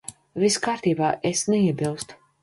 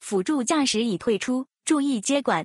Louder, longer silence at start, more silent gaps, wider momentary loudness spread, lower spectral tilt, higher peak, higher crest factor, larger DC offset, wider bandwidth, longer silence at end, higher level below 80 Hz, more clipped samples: about the same, -23 LUFS vs -24 LUFS; about the same, 0.1 s vs 0 s; neither; first, 13 LU vs 4 LU; about the same, -4.5 dB/octave vs -3.5 dB/octave; about the same, -8 dBFS vs -8 dBFS; about the same, 16 dB vs 16 dB; neither; about the same, 11.5 kHz vs 12.5 kHz; first, 0.3 s vs 0 s; first, -60 dBFS vs -66 dBFS; neither